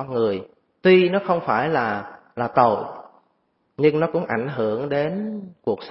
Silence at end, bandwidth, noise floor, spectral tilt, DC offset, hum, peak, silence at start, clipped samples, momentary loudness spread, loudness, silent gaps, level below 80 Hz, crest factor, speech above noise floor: 0 s; 5.8 kHz; -68 dBFS; -11 dB/octave; under 0.1%; none; -2 dBFS; 0 s; under 0.1%; 14 LU; -21 LUFS; none; -62 dBFS; 20 dB; 47 dB